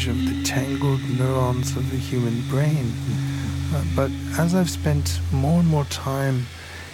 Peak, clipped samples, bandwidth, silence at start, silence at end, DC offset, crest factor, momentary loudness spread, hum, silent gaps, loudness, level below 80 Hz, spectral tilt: -8 dBFS; under 0.1%; 17 kHz; 0 s; 0 s; under 0.1%; 14 dB; 5 LU; none; none; -23 LUFS; -38 dBFS; -6 dB/octave